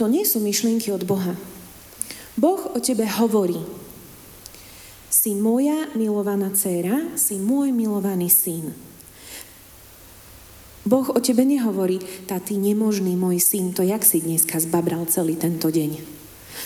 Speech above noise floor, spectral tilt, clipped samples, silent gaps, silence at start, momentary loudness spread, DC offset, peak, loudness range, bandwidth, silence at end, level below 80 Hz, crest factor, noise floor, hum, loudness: 25 dB; -4.5 dB/octave; under 0.1%; none; 0 s; 23 LU; under 0.1%; -4 dBFS; 5 LU; over 20 kHz; 0 s; -58 dBFS; 18 dB; -45 dBFS; none; -21 LUFS